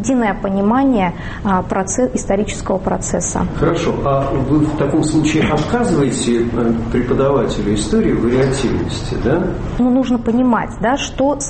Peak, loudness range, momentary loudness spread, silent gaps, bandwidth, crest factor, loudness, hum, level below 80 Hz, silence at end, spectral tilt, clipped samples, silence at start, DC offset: -4 dBFS; 2 LU; 4 LU; none; 8.8 kHz; 12 dB; -16 LUFS; none; -30 dBFS; 0 s; -5.5 dB/octave; under 0.1%; 0 s; under 0.1%